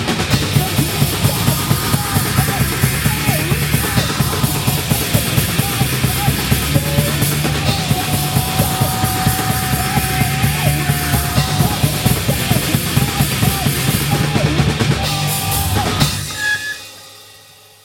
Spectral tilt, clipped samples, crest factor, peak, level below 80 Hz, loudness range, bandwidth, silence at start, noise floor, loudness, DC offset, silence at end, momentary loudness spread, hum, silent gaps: -4 dB/octave; under 0.1%; 16 dB; 0 dBFS; -30 dBFS; 0 LU; 17 kHz; 0 s; -43 dBFS; -16 LUFS; under 0.1%; 0.45 s; 1 LU; none; none